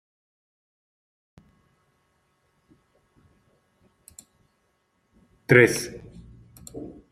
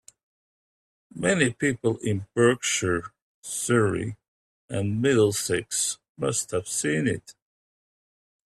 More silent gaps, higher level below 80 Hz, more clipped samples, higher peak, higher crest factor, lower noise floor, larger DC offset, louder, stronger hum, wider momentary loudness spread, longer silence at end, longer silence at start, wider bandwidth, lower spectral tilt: second, none vs 3.22-3.43 s, 4.28-4.68 s, 6.09-6.15 s; about the same, -60 dBFS vs -62 dBFS; neither; first, -2 dBFS vs -6 dBFS; first, 28 dB vs 20 dB; second, -71 dBFS vs under -90 dBFS; neither; first, -19 LUFS vs -25 LUFS; neither; first, 29 LU vs 12 LU; second, 0.2 s vs 1.2 s; first, 5.5 s vs 1.15 s; about the same, 15 kHz vs 15 kHz; first, -5.5 dB/octave vs -4 dB/octave